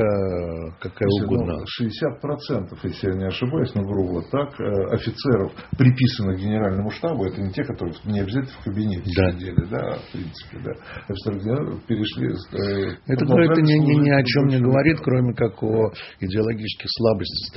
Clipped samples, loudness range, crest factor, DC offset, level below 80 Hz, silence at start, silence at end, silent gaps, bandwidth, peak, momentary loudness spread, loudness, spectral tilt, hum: under 0.1%; 8 LU; 20 dB; under 0.1%; -46 dBFS; 0 s; 0 s; none; 6 kHz; -2 dBFS; 12 LU; -22 LUFS; -6.5 dB/octave; none